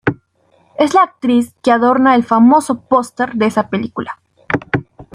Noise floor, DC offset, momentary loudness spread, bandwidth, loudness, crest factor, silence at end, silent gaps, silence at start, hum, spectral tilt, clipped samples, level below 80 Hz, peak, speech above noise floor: -55 dBFS; under 0.1%; 14 LU; 14.5 kHz; -14 LUFS; 14 dB; 0.1 s; none; 0.05 s; none; -6 dB/octave; under 0.1%; -50 dBFS; -2 dBFS; 42 dB